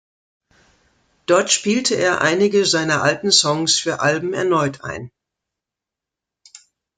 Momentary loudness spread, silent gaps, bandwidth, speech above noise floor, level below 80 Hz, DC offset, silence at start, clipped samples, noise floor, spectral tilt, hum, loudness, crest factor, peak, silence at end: 10 LU; none; 9.6 kHz; 68 dB; -60 dBFS; under 0.1%; 1.3 s; under 0.1%; -86 dBFS; -3 dB/octave; none; -17 LUFS; 18 dB; -2 dBFS; 1.9 s